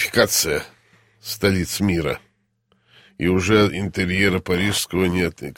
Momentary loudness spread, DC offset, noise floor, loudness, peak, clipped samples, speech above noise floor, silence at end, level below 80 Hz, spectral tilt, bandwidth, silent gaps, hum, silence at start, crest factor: 10 LU; under 0.1%; -65 dBFS; -20 LUFS; -2 dBFS; under 0.1%; 45 dB; 0.05 s; -44 dBFS; -4 dB/octave; 16.5 kHz; none; none; 0 s; 20 dB